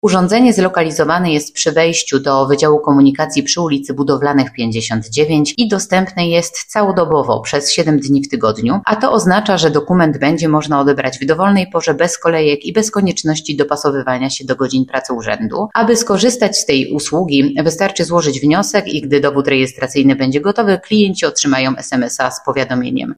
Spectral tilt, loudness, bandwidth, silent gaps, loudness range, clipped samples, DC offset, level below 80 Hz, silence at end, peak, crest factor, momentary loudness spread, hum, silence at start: -4.5 dB/octave; -14 LUFS; 15.5 kHz; none; 2 LU; under 0.1%; under 0.1%; -48 dBFS; 0.05 s; 0 dBFS; 14 dB; 5 LU; none; 0.05 s